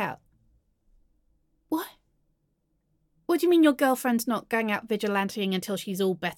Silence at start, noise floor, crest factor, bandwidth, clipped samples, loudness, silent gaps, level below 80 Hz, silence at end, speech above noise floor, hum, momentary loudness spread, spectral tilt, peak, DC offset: 0 s; -74 dBFS; 20 dB; 17.5 kHz; under 0.1%; -26 LUFS; none; -70 dBFS; 0.05 s; 48 dB; none; 13 LU; -5 dB/octave; -8 dBFS; under 0.1%